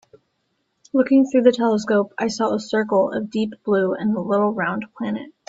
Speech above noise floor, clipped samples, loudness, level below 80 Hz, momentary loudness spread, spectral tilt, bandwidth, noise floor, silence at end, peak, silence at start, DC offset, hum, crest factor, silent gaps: 52 dB; under 0.1%; -20 LUFS; -64 dBFS; 9 LU; -6 dB/octave; 7.8 kHz; -71 dBFS; 0.2 s; -2 dBFS; 0.95 s; under 0.1%; none; 18 dB; none